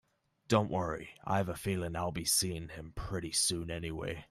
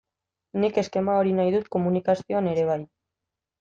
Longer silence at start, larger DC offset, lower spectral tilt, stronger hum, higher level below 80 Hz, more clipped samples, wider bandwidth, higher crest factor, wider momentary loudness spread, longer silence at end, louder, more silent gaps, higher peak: about the same, 0.5 s vs 0.55 s; neither; second, -3.5 dB/octave vs -7.5 dB/octave; neither; first, -54 dBFS vs -66 dBFS; neither; first, 15.5 kHz vs 7.4 kHz; first, 22 dB vs 16 dB; first, 11 LU vs 5 LU; second, 0.05 s vs 0.75 s; second, -34 LUFS vs -24 LUFS; neither; second, -14 dBFS vs -10 dBFS